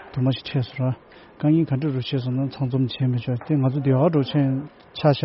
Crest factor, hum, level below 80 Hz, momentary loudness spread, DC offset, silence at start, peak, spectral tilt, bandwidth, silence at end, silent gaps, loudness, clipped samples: 16 dB; none; -58 dBFS; 7 LU; under 0.1%; 0 s; -6 dBFS; -7.5 dB/octave; 5.8 kHz; 0 s; none; -23 LUFS; under 0.1%